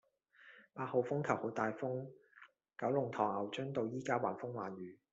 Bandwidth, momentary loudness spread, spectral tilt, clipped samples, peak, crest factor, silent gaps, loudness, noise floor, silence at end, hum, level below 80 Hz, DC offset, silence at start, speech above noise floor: 8 kHz; 14 LU; -5.5 dB/octave; under 0.1%; -18 dBFS; 22 dB; none; -39 LUFS; -65 dBFS; 0.15 s; none; -82 dBFS; under 0.1%; 0.4 s; 26 dB